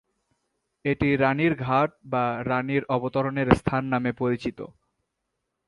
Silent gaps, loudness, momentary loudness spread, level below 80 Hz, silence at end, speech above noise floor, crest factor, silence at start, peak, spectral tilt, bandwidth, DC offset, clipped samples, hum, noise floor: none; -25 LUFS; 8 LU; -48 dBFS; 0.95 s; 56 dB; 24 dB; 0.85 s; -2 dBFS; -8 dB/octave; 11.5 kHz; under 0.1%; under 0.1%; none; -80 dBFS